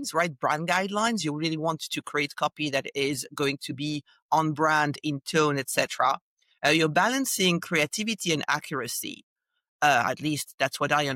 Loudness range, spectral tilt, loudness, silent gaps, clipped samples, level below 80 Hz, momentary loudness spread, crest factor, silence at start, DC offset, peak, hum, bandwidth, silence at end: 3 LU; -3.5 dB/octave; -26 LUFS; 4.22-4.29 s, 6.21-6.37 s, 9.23-9.36 s, 9.68-9.79 s, 10.54-10.58 s; under 0.1%; -70 dBFS; 9 LU; 18 dB; 0 s; under 0.1%; -10 dBFS; none; 16.5 kHz; 0 s